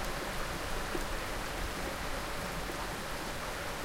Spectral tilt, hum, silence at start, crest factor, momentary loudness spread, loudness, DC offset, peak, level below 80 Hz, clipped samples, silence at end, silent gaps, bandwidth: -3.5 dB/octave; none; 0 s; 16 dB; 1 LU; -37 LUFS; under 0.1%; -22 dBFS; -42 dBFS; under 0.1%; 0 s; none; 17 kHz